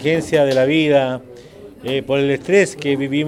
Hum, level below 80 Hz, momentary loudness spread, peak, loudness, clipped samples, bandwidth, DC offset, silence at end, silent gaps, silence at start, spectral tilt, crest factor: none; -52 dBFS; 9 LU; 0 dBFS; -17 LUFS; under 0.1%; 13 kHz; under 0.1%; 0 s; none; 0 s; -5.5 dB/octave; 16 dB